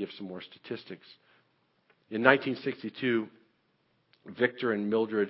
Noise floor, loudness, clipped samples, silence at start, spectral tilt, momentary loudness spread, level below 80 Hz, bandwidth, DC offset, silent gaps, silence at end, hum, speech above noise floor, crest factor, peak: -72 dBFS; -30 LUFS; under 0.1%; 0 s; -9.5 dB/octave; 20 LU; -74 dBFS; 5.8 kHz; under 0.1%; none; 0 s; none; 42 dB; 30 dB; -2 dBFS